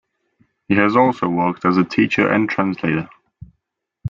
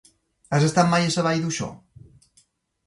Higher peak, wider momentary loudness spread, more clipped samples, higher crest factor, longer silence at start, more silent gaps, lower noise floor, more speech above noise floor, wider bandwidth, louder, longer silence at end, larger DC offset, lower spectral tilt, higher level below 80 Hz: about the same, -2 dBFS vs -4 dBFS; second, 7 LU vs 10 LU; neither; about the same, 18 dB vs 20 dB; first, 0.7 s vs 0.5 s; neither; first, -75 dBFS vs -63 dBFS; first, 58 dB vs 42 dB; second, 7.4 kHz vs 11.5 kHz; first, -17 LUFS vs -22 LUFS; second, 0 s vs 1.1 s; neither; first, -7.5 dB/octave vs -5 dB/octave; about the same, -54 dBFS vs -58 dBFS